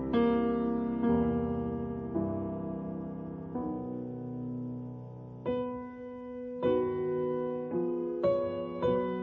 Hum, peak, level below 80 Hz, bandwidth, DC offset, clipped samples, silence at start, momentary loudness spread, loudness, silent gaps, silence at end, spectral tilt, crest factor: none; -16 dBFS; -54 dBFS; 4.3 kHz; under 0.1%; under 0.1%; 0 s; 12 LU; -33 LUFS; none; 0 s; -10.5 dB/octave; 16 dB